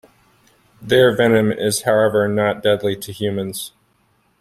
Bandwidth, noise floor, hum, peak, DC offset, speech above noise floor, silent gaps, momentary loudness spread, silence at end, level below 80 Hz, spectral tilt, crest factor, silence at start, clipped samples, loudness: 16 kHz; -61 dBFS; none; -2 dBFS; under 0.1%; 44 dB; none; 11 LU; 0.75 s; -56 dBFS; -4.5 dB/octave; 18 dB; 0.8 s; under 0.1%; -17 LUFS